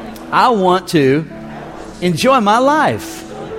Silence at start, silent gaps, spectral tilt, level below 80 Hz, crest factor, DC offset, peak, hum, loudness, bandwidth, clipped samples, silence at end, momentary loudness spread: 0 s; none; -5.5 dB/octave; -46 dBFS; 14 dB; under 0.1%; 0 dBFS; none; -13 LUFS; 16.5 kHz; under 0.1%; 0 s; 18 LU